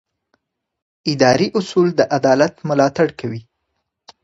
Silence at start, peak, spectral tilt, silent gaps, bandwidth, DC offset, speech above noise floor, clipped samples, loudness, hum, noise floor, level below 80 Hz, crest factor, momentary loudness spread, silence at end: 1.05 s; 0 dBFS; -5.5 dB/octave; none; 8 kHz; under 0.1%; 58 dB; under 0.1%; -16 LUFS; none; -74 dBFS; -56 dBFS; 18 dB; 12 LU; 0.85 s